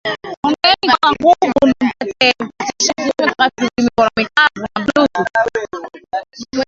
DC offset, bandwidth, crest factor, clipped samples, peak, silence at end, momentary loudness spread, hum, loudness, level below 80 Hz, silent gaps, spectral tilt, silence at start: under 0.1%; 7.8 kHz; 16 dB; under 0.1%; 0 dBFS; 0.05 s; 12 LU; none; -15 LUFS; -48 dBFS; 0.37-0.43 s; -2.5 dB/octave; 0.05 s